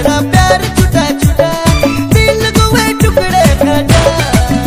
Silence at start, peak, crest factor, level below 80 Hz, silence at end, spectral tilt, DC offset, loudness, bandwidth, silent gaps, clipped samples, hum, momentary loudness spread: 0 s; 0 dBFS; 8 dB; -18 dBFS; 0 s; -5 dB/octave; under 0.1%; -9 LUFS; 16.5 kHz; none; 2%; none; 2 LU